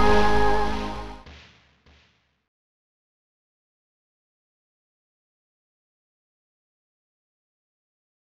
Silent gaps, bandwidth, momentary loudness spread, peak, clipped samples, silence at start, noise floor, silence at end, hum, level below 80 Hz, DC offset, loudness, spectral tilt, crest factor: none; 12 kHz; 23 LU; -6 dBFS; under 0.1%; 0 s; -63 dBFS; 5.8 s; none; -40 dBFS; under 0.1%; -23 LUFS; -5.5 dB/octave; 20 dB